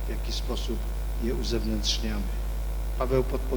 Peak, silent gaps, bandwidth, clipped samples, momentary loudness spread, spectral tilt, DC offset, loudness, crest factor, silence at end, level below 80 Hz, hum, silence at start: -12 dBFS; none; over 20 kHz; under 0.1%; 6 LU; -5 dB/octave; under 0.1%; -30 LUFS; 16 dB; 0 s; -30 dBFS; 50 Hz at -30 dBFS; 0 s